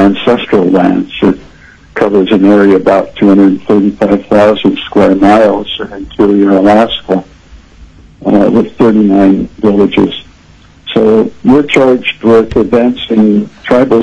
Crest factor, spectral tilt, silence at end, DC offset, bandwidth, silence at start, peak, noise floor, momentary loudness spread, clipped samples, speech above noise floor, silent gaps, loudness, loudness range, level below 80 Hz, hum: 8 dB; -7.5 dB/octave; 0 s; under 0.1%; 8.8 kHz; 0 s; 0 dBFS; -39 dBFS; 8 LU; 0.1%; 32 dB; none; -8 LUFS; 2 LU; -38 dBFS; none